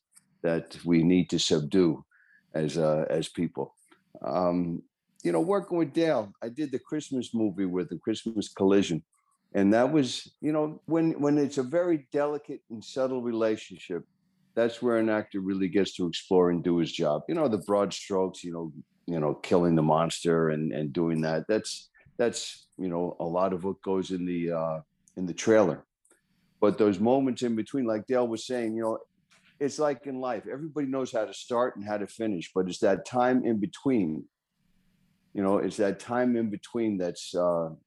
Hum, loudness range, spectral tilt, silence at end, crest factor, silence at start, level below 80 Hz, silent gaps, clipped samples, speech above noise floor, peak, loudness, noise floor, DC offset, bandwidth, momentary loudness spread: none; 4 LU; -6 dB/octave; 0.1 s; 18 dB; 0.45 s; -66 dBFS; none; under 0.1%; 44 dB; -10 dBFS; -28 LUFS; -71 dBFS; under 0.1%; 12 kHz; 11 LU